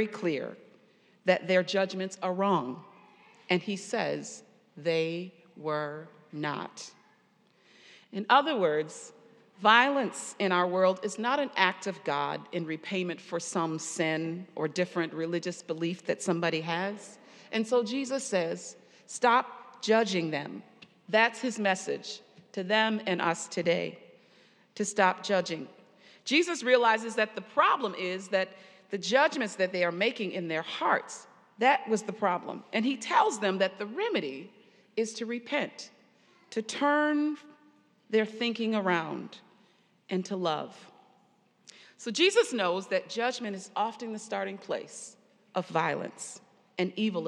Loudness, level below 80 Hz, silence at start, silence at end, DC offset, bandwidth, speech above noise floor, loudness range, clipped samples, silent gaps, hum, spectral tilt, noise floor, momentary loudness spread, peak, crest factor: -29 LUFS; under -90 dBFS; 0 s; 0 s; under 0.1%; 12 kHz; 37 dB; 7 LU; under 0.1%; none; none; -4 dB/octave; -66 dBFS; 16 LU; -6 dBFS; 24 dB